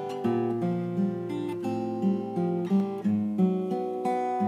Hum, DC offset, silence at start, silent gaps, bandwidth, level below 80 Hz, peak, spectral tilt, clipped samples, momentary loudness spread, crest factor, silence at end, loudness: none; under 0.1%; 0 s; none; 10 kHz; -74 dBFS; -14 dBFS; -9 dB/octave; under 0.1%; 5 LU; 14 dB; 0 s; -28 LUFS